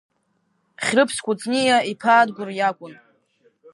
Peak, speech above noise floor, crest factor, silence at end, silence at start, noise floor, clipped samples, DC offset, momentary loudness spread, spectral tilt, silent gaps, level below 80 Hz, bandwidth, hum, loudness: -4 dBFS; 49 dB; 18 dB; 0.8 s; 0.8 s; -69 dBFS; under 0.1%; under 0.1%; 8 LU; -3 dB/octave; none; -68 dBFS; 11.5 kHz; none; -20 LUFS